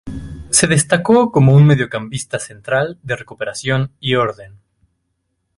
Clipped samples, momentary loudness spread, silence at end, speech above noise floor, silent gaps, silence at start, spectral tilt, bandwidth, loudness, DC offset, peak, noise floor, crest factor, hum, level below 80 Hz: under 0.1%; 14 LU; 1.1 s; 55 dB; none; 0.05 s; -5 dB/octave; 11.5 kHz; -15 LUFS; under 0.1%; 0 dBFS; -70 dBFS; 16 dB; none; -44 dBFS